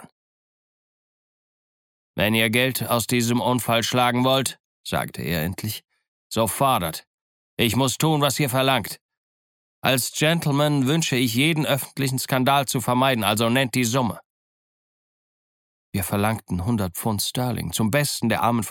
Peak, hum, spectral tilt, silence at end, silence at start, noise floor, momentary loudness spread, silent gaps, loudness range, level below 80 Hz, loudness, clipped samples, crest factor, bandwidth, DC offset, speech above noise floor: -4 dBFS; none; -4.5 dB/octave; 0 s; 2.15 s; under -90 dBFS; 9 LU; 4.60-4.84 s, 6.08-6.30 s, 7.07-7.57 s, 9.01-9.09 s, 9.17-9.82 s, 14.25-15.93 s; 5 LU; -54 dBFS; -22 LUFS; under 0.1%; 20 dB; 17.5 kHz; under 0.1%; over 68 dB